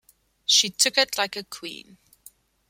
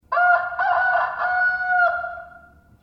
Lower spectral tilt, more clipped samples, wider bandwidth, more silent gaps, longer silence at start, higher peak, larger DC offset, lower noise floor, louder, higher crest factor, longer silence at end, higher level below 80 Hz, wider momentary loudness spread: second, 0.5 dB/octave vs -4 dB/octave; neither; first, 16.5 kHz vs 5.8 kHz; neither; first, 0.5 s vs 0.1 s; about the same, -4 dBFS vs -6 dBFS; neither; first, -54 dBFS vs -49 dBFS; about the same, -21 LUFS vs -20 LUFS; first, 22 dB vs 14 dB; first, 0.9 s vs 0.45 s; second, -70 dBFS vs -58 dBFS; first, 18 LU vs 10 LU